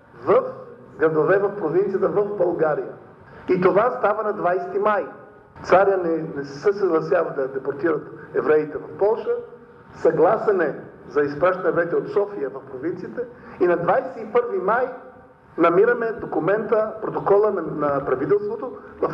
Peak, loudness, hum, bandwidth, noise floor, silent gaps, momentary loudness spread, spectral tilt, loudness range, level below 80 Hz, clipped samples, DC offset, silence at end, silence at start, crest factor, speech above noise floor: -4 dBFS; -21 LUFS; none; 6.8 kHz; -46 dBFS; none; 12 LU; -8 dB/octave; 2 LU; -60 dBFS; under 0.1%; under 0.1%; 0 s; 0.15 s; 16 dB; 25 dB